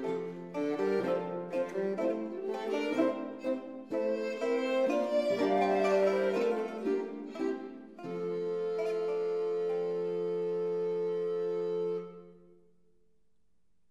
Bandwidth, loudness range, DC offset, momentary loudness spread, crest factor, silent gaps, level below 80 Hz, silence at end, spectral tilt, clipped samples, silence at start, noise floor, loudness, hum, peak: 11 kHz; 5 LU; under 0.1%; 9 LU; 16 dB; none; -80 dBFS; 1.55 s; -6.5 dB/octave; under 0.1%; 0 s; -79 dBFS; -33 LUFS; none; -16 dBFS